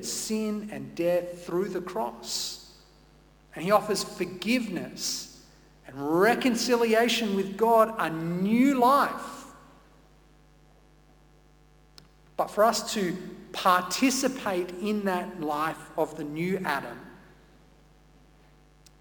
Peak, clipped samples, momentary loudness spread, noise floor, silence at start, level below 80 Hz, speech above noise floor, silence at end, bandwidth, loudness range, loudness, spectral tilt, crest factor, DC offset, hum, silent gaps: -8 dBFS; under 0.1%; 13 LU; -58 dBFS; 0 s; -60 dBFS; 31 dB; 1.85 s; 19 kHz; 8 LU; -27 LUFS; -4 dB/octave; 22 dB; under 0.1%; none; none